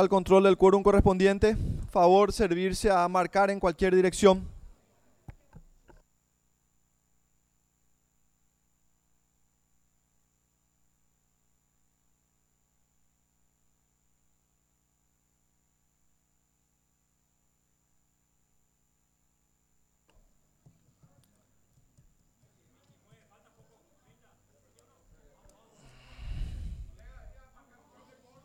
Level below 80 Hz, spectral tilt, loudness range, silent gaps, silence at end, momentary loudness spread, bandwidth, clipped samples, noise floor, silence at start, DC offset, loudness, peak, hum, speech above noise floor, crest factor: -46 dBFS; -6 dB/octave; 24 LU; none; 1.15 s; 20 LU; 13.5 kHz; under 0.1%; -74 dBFS; 0 s; under 0.1%; -24 LUFS; -8 dBFS; none; 51 dB; 24 dB